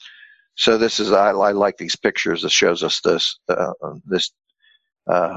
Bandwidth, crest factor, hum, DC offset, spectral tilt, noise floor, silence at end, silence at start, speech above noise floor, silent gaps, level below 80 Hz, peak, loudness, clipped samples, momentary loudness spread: 8.2 kHz; 18 dB; none; under 0.1%; -3 dB/octave; -48 dBFS; 0 s; 0.05 s; 29 dB; none; -58 dBFS; -2 dBFS; -18 LUFS; under 0.1%; 9 LU